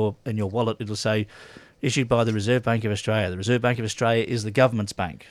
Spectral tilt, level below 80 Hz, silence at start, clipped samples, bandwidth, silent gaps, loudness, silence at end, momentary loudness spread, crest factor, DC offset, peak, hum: -5.5 dB/octave; -54 dBFS; 0 s; under 0.1%; 13.5 kHz; none; -24 LUFS; 0.05 s; 7 LU; 18 dB; under 0.1%; -6 dBFS; none